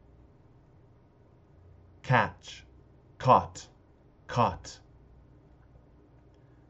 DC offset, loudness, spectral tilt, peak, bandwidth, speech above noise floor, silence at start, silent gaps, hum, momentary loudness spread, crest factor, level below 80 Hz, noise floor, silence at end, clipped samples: under 0.1%; -27 LUFS; -4.5 dB/octave; -8 dBFS; 8 kHz; 32 dB; 2.05 s; none; none; 24 LU; 26 dB; -60 dBFS; -59 dBFS; 1.95 s; under 0.1%